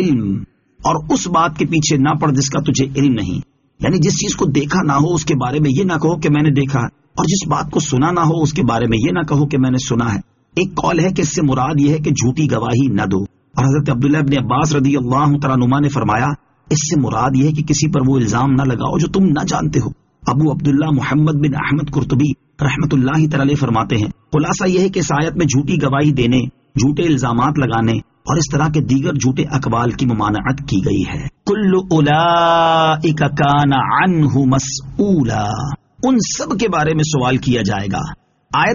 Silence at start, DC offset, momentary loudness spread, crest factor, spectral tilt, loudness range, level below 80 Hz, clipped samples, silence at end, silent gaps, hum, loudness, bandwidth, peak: 0 s; under 0.1%; 6 LU; 14 dB; -6 dB/octave; 2 LU; -38 dBFS; under 0.1%; 0 s; none; none; -16 LUFS; 7.4 kHz; -2 dBFS